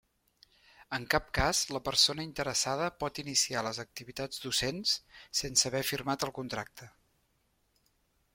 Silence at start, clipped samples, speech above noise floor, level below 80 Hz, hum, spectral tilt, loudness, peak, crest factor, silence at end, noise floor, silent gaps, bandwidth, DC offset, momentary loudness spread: 0.8 s; under 0.1%; 41 dB; -52 dBFS; none; -2 dB/octave; -31 LUFS; -10 dBFS; 24 dB; 1.45 s; -74 dBFS; none; 16.5 kHz; under 0.1%; 12 LU